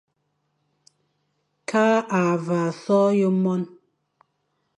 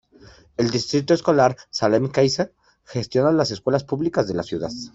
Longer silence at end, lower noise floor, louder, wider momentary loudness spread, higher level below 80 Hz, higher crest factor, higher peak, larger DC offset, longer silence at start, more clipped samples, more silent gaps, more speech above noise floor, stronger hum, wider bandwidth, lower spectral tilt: first, 1.1 s vs 0.05 s; first, -73 dBFS vs -49 dBFS; about the same, -21 LUFS vs -21 LUFS; about the same, 9 LU vs 10 LU; second, -74 dBFS vs -56 dBFS; about the same, 16 dB vs 18 dB; second, -8 dBFS vs -4 dBFS; neither; first, 1.7 s vs 0.6 s; neither; neither; first, 53 dB vs 29 dB; neither; first, 10.5 kHz vs 8 kHz; first, -7 dB/octave vs -5.5 dB/octave